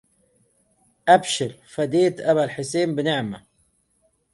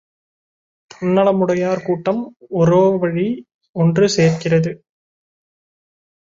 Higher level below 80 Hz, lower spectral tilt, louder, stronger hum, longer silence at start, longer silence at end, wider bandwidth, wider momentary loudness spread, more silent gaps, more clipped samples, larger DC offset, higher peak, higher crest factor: second, -64 dBFS vs -56 dBFS; second, -4.5 dB/octave vs -6.5 dB/octave; second, -22 LUFS vs -17 LUFS; neither; about the same, 1.05 s vs 1 s; second, 0.95 s vs 1.45 s; first, 11.5 kHz vs 7.8 kHz; about the same, 11 LU vs 11 LU; second, none vs 3.54-3.61 s, 3.69-3.74 s; neither; neither; about the same, -4 dBFS vs -2 dBFS; about the same, 20 dB vs 16 dB